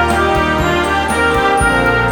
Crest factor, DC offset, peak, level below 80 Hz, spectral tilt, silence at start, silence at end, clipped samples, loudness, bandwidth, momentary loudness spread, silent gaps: 12 dB; under 0.1%; -2 dBFS; -26 dBFS; -4.5 dB/octave; 0 s; 0 s; under 0.1%; -13 LUFS; 19.5 kHz; 2 LU; none